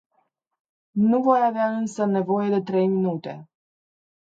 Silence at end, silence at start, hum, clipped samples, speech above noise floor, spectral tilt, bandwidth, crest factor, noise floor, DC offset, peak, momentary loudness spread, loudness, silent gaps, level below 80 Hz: 0.8 s; 0.95 s; none; under 0.1%; 49 dB; -8 dB/octave; 8 kHz; 18 dB; -70 dBFS; under 0.1%; -6 dBFS; 13 LU; -22 LUFS; none; -72 dBFS